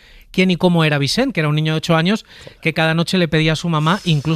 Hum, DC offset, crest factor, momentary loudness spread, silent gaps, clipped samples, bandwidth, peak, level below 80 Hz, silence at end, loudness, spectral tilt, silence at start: none; under 0.1%; 14 dB; 5 LU; none; under 0.1%; 14 kHz; -2 dBFS; -44 dBFS; 0 s; -17 LUFS; -6 dB/octave; 0.35 s